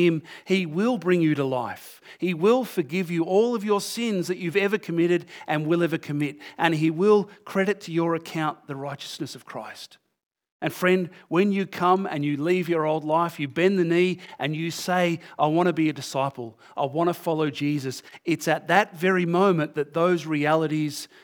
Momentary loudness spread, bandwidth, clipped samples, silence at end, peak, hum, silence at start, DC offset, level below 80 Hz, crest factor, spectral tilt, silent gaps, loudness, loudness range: 11 LU; over 20 kHz; under 0.1%; 0.2 s; -2 dBFS; none; 0 s; under 0.1%; -82 dBFS; 22 dB; -6 dB/octave; 10.26-10.31 s, 10.51-10.60 s; -24 LUFS; 4 LU